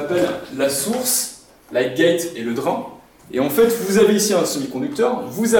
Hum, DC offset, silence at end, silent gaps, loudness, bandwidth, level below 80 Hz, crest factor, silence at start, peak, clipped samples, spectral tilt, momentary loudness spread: none; under 0.1%; 0 s; none; -19 LUFS; 19 kHz; -56 dBFS; 14 dB; 0 s; -4 dBFS; under 0.1%; -3.5 dB/octave; 9 LU